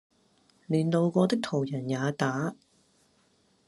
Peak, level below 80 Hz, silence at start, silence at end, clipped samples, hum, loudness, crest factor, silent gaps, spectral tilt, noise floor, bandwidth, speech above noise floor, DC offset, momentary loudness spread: -10 dBFS; -72 dBFS; 0.7 s; 1.15 s; under 0.1%; none; -28 LUFS; 20 dB; none; -6.5 dB/octave; -67 dBFS; 12 kHz; 40 dB; under 0.1%; 6 LU